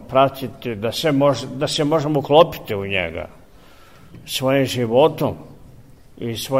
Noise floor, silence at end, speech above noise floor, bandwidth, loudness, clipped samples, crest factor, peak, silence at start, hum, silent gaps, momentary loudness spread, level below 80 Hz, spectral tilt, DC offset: -47 dBFS; 0 s; 29 dB; 16 kHz; -19 LUFS; under 0.1%; 20 dB; 0 dBFS; 0 s; none; none; 14 LU; -50 dBFS; -5.5 dB/octave; 0.3%